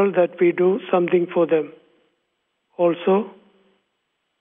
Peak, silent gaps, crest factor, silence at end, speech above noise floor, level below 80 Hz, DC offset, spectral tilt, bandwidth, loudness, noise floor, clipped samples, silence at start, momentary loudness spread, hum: -6 dBFS; none; 16 dB; 1.1 s; 55 dB; -80 dBFS; under 0.1%; -6 dB/octave; 3.7 kHz; -20 LUFS; -74 dBFS; under 0.1%; 0 s; 11 LU; none